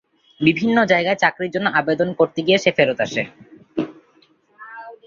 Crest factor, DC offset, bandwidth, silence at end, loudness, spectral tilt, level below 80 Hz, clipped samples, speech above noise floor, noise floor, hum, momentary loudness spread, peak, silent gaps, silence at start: 18 dB; under 0.1%; 7.4 kHz; 0.1 s; -18 LUFS; -5.5 dB/octave; -60 dBFS; under 0.1%; 39 dB; -57 dBFS; none; 15 LU; -2 dBFS; none; 0.4 s